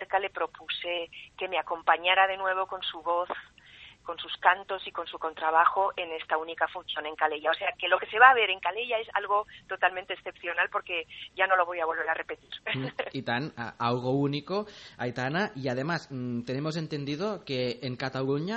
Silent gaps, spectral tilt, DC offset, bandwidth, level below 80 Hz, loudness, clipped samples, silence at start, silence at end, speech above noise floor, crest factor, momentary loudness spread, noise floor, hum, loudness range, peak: none; -5.5 dB/octave; under 0.1%; 8.4 kHz; -68 dBFS; -29 LUFS; under 0.1%; 0 s; 0 s; 23 dB; 26 dB; 12 LU; -52 dBFS; none; 6 LU; -4 dBFS